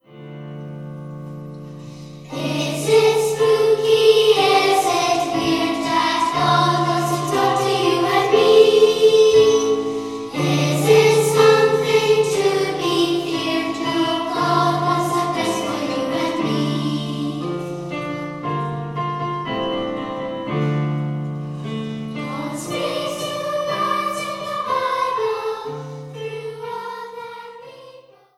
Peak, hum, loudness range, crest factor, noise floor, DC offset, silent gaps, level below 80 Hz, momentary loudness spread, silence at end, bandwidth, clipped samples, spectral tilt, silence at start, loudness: 0 dBFS; none; 10 LU; 18 dB; -46 dBFS; under 0.1%; none; -56 dBFS; 19 LU; 0.4 s; 14 kHz; under 0.1%; -5 dB/octave; 0.1 s; -18 LUFS